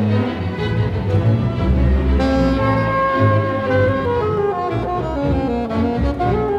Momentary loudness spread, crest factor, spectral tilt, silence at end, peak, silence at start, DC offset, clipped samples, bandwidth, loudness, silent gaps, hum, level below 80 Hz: 5 LU; 12 dB; -8.5 dB/octave; 0 s; -4 dBFS; 0 s; under 0.1%; under 0.1%; 7.8 kHz; -18 LUFS; none; none; -26 dBFS